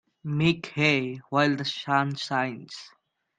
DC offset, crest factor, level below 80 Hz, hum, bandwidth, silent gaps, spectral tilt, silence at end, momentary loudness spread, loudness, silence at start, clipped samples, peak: under 0.1%; 20 dB; -64 dBFS; none; 9.4 kHz; none; -5.5 dB/octave; 0.5 s; 11 LU; -26 LUFS; 0.25 s; under 0.1%; -8 dBFS